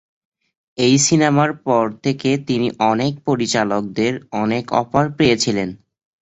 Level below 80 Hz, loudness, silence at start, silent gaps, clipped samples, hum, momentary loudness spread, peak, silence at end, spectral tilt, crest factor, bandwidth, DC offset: -52 dBFS; -18 LUFS; 0.8 s; none; under 0.1%; none; 7 LU; -2 dBFS; 0.45 s; -4.5 dB/octave; 16 dB; 8.2 kHz; under 0.1%